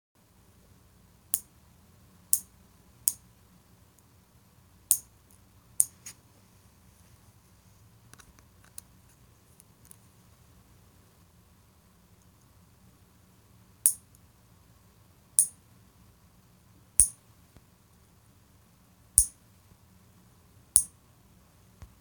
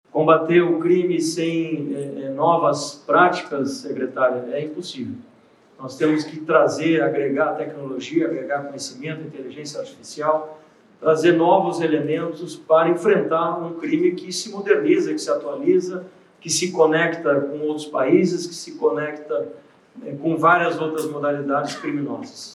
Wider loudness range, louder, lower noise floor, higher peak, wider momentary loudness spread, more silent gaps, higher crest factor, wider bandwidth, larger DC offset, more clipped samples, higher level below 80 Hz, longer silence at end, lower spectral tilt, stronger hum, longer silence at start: about the same, 5 LU vs 4 LU; second, -26 LUFS vs -21 LUFS; first, -61 dBFS vs -53 dBFS; about the same, 0 dBFS vs -2 dBFS; first, 24 LU vs 15 LU; neither; first, 36 dB vs 20 dB; first, over 20 kHz vs 13 kHz; neither; neither; first, -56 dBFS vs -78 dBFS; first, 1.15 s vs 0 s; second, -0.5 dB/octave vs -5 dB/octave; neither; first, 1.35 s vs 0.15 s